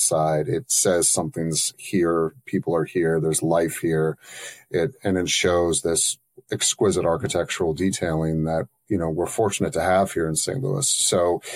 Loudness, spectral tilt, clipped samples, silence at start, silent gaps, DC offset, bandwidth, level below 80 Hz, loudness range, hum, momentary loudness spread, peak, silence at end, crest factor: -22 LUFS; -3.5 dB/octave; under 0.1%; 0 s; none; under 0.1%; 16 kHz; -50 dBFS; 2 LU; none; 7 LU; -6 dBFS; 0 s; 16 dB